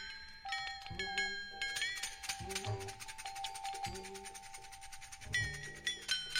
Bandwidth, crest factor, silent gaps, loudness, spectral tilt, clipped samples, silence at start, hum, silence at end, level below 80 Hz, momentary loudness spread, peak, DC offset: 16 kHz; 24 dB; none; -41 LUFS; -1.5 dB/octave; under 0.1%; 0 s; none; 0 s; -60 dBFS; 13 LU; -20 dBFS; under 0.1%